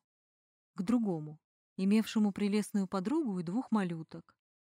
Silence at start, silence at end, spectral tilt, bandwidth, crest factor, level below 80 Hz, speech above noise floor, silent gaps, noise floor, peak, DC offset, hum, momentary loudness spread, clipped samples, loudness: 0.75 s; 0.4 s; -6.5 dB/octave; 15.5 kHz; 14 dB; -74 dBFS; over 58 dB; 1.44-1.76 s; under -90 dBFS; -20 dBFS; under 0.1%; none; 19 LU; under 0.1%; -33 LUFS